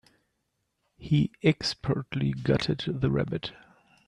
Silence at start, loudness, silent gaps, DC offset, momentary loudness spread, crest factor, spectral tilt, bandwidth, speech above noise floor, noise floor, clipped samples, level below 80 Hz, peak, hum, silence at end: 1 s; -28 LUFS; none; under 0.1%; 8 LU; 20 dB; -6.5 dB/octave; 10.5 kHz; 51 dB; -78 dBFS; under 0.1%; -52 dBFS; -8 dBFS; none; 0.55 s